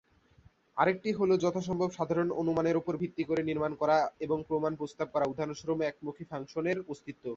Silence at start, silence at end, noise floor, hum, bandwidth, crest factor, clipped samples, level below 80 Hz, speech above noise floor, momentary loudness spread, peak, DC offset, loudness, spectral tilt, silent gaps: 0.75 s; 0 s; -63 dBFS; none; 7.8 kHz; 20 dB; under 0.1%; -64 dBFS; 32 dB; 10 LU; -12 dBFS; under 0.1%; -32 LUFS; -6.5 dB/octave; none